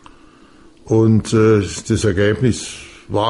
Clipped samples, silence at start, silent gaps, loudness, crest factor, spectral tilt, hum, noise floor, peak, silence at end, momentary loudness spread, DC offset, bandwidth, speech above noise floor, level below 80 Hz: under 0.1%; 0.85 s; none; -16 LUFS; 14 dB; -6 dB/octave; none; -45 dBFS; -4 dBFS; 0 s; 11 LU; under 0.1%; 11.5 kHz; 31 dB; -40 dBFS